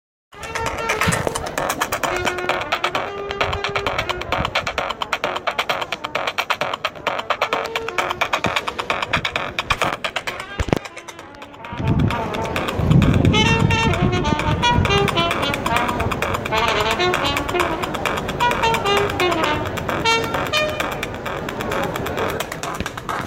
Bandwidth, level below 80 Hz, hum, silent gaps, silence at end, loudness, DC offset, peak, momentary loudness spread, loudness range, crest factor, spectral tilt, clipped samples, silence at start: 17 kHz; -36 dBFS; none; none; 0 s; -20 LUFS; under 0.1%; 0 dBFS; 9 LU; 5 LU; 20 dB; -4.5 dB/octave; under 0.1%; 0.35 s